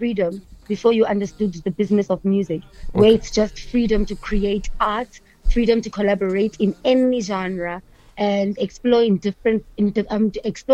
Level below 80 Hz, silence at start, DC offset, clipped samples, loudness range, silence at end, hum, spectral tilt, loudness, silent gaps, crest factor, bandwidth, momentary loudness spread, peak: -32 dBFS; 0 s; under 0.1%; under 0.1%; 2 LU; 0 s; none; -6.5 dB/octave; -20 LUFS; none; 16 dB; 8.6 kHz; 10 LU; -2 dBFS